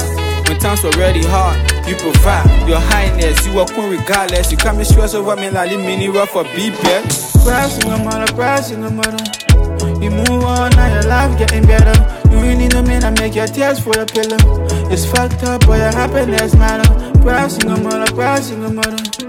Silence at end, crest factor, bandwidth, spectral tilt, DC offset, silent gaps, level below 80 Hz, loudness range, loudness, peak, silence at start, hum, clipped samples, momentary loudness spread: 0 s; 12 dB; 17 kHz; -5 dB/octave; under 0.1%; none; -16 dBFS; 3 LU; -13 LUFS; 0 dBFS; 0 s; none; under 0.1%; 6 LU